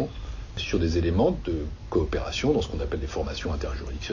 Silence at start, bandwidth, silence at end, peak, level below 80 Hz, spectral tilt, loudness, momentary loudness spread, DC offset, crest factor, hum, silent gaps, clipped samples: 0 s; 7.4 kHz; 0 s; -10 dBFS; -34 dBFS; -6 dB/octave; -28 LUFS; 9 LU; under 0.1%; 18 dB; none; none; under 0.1%